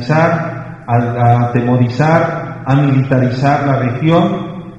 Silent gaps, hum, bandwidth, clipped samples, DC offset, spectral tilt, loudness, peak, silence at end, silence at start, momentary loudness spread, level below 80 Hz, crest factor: none; none; 7.6 kHz; under 0.1%; under 0.1%; -8.5 dB/octave; -13 LUFS; 0 dBFS; 0 s; 0 s; 7 LU; -44 dBFS; 12 dB